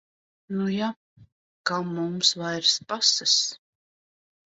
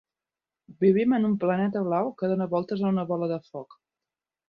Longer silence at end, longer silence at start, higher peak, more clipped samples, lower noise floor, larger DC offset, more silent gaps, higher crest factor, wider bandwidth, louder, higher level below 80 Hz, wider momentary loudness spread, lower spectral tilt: about the same, 0.95 s vs 0.85 s; second, 0.5 s vs 0.7 s; first, -6 dBFS vs -10 dBFS; neither; about the same, under -90 dBFS vs under -90 dBFS; neither; first, 0.96-1.16 s, 1.32-1.64 s vs none; about the same, 22 dB vs 18 dB; first, 8.2 kHz vs 5.2 kHz; about the same, -24 LUFS vs -26 LUFS; about the same, -72 dBFS vs -70 dBFS; about the same, 10 LU vs 9 LU; second, -2.5 dB/octave vs -10.5 dB/octave